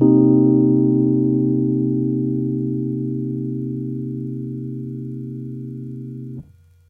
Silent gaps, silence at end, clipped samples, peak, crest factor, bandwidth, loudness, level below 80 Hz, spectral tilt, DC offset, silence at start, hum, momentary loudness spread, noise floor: none; 0.5 s; under 0.1%; -2 dBFS; 18 dB; 1.3 kHz; -20 LUFS; -56 dBFS; -14 dB/octave; under 0.1%; 0 s; none; 17 LU; -43 dBFS